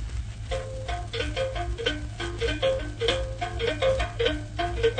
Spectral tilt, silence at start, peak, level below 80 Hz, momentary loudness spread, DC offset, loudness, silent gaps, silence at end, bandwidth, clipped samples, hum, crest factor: -5 dB/octave; 0 s; -8 dBFS; -36 dBFS; 8 LU; under 0.1%; -29 LUFS; none; 0 s; 9.6 kHz; under 0.1%; none; 20 dB